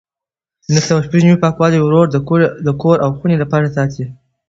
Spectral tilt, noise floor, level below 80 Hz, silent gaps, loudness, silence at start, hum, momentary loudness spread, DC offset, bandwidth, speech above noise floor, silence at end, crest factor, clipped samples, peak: -6.5 dB/octave; -88 dBFS; -48 dBFS; none; -13 LUFS; 0.7 s; none; 6 LU; under 0.1%; 7.8 kHz; 76 dB; 0.35 s; 14 dB; under 0.1%; 0 dBFS